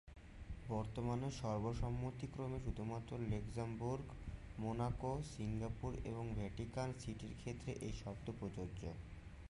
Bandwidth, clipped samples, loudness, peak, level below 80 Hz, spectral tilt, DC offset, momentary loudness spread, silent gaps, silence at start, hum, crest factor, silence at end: 11.5 kHz; under 0.1%; -46 LUFS; -28 dBFS; -54 dBFS; -7 dB/octave; under 0.1%; 9 LU; none; 0.05 s; none; 16 dB; 0 s